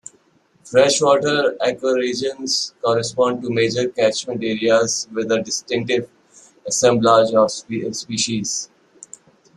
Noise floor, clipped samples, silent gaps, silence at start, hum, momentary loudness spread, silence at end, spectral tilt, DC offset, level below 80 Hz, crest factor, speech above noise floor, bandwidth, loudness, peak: -58 dBFS; under 0.1%; none; 0.65 s; none; 10 LU; 0.9 s; -3.5 dB/octave; under 0.1%; -60 dBFS; 18 dB; 40 dB; 12.5 kHz; -19 LUFS; 0 dBFS